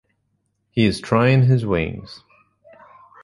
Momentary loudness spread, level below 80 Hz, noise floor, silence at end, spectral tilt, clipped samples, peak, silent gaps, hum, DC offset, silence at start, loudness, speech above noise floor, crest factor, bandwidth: 16 LU; -44 dBFS; -70 dBFS; 1.1 s; -7.5 dB/octave; under 0.1%; -4 dBFS; none; none; under 0.1%; 0.75 s; -19 LUFS; 52 dB; 18 dB; 11.5 kHz